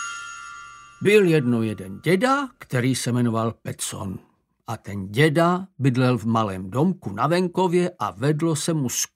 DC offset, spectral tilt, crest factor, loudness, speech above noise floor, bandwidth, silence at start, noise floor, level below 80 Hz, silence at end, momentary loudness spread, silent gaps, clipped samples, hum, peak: under 0.1%; -5.5 dB/octave; 20 dB; -22 LUFS; 20 dB; 16 kHz; 0 s; -42 dBFS; -62 dBFS; 0.1 s; 16 LU; none; under 0.1%; none; -4 dBFS